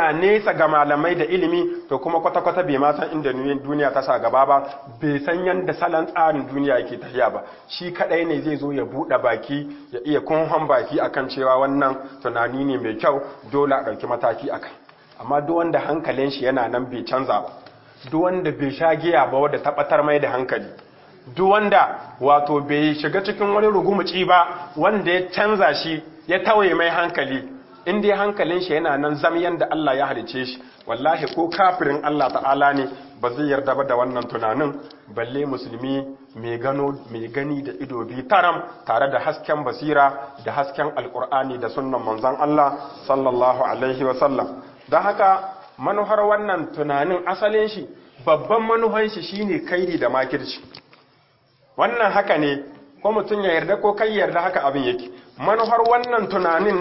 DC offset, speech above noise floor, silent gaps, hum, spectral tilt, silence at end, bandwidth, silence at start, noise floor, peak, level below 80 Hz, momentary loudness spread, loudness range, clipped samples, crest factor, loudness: under 0.1%; 38 dB; none; none; -10 dB/octave; 0 s; 5.8 kHz; 0 s; -58 dBFS; -2 dBFS; -60 dBFS; 11 LU; 4 LU; under 0.1%; 18 dB; -21 LUFS